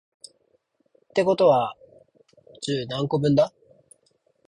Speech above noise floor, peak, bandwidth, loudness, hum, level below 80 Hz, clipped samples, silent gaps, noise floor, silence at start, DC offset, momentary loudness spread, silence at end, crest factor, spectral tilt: 47 dB; -8 dBFS; 11 kHz; -23 LUFS; none; -62 dBFS; under 0.1%; none; -68 dBFS; 1.15 s; under 0.1%; 10 LU; 1 s; 18 dB; -6.5 dB/octave